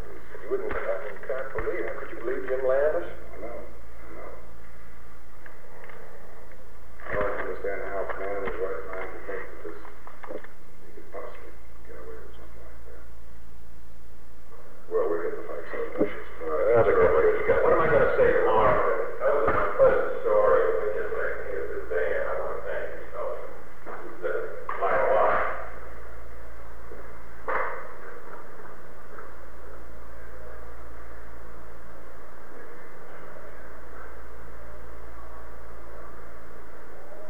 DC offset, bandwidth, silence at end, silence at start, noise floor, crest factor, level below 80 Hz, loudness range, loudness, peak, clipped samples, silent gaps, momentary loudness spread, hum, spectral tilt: 6%; 19.5 kHz; 0 s; 0 s; -50 dBFS; 20 dB; -48 dBFS; 23 LU; -27 LUFS; -8 dBFS; under 0.1%; none; 25 LU; none; -7 dB/octave